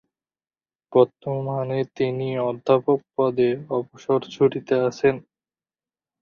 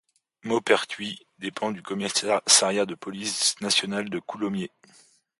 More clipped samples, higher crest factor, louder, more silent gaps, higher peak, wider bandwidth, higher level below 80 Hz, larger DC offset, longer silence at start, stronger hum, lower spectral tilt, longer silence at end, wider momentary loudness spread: neither; about the same, 20 dB vs 24 dB; about the same, -23 LUFS vs -24 LUFS; neither; about the same, -4 dBFS vs -4 dBFS; second, 7 kHz vs 12 kHz; first, -64 dBFS vs -70 dBFS; neither; first, 0.9 s vs 0.45 s; neither; first, -7.5 dB/octave vs -2 dB/octave; first, 1 s vs 0.7 s; second, 7 LU vs 16 LU